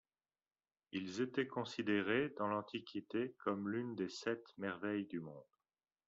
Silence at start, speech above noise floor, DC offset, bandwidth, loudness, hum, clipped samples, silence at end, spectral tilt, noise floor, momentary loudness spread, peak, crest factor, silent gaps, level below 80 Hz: 0.95 s; over 49 dB; under 0.1%; 7.4 kHz; -41 LUFS; none; under 0.1%; 0.65 s; -4 dB/octave; under -90 dBFS; 9 LU; -22 dBFS; 20 dB; none; -82 dBFS